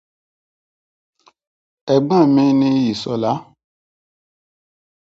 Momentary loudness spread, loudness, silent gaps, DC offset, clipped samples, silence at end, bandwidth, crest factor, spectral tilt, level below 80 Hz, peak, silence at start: 10 LU; -16 LUFS; none; under 0.1%; under 0.1%; 1.7 s; 7.8 kHz; 20 dB; -7.5 dB/octave; -62 dBFS; 0 dBFS; 1.85 s